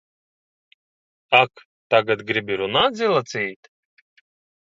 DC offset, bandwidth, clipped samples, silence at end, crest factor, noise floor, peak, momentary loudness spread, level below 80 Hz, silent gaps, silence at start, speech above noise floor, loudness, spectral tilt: under 0.1%; 7.8 kHz; under 0.1%; 1.15 s; 24 dB; under -90 dBFS; 0 dBFS; 9 LU; -62 dBFS; 1.65-1.90 s; 1.3 s; over 70 dB; -20 LUFS; -4 dB/octave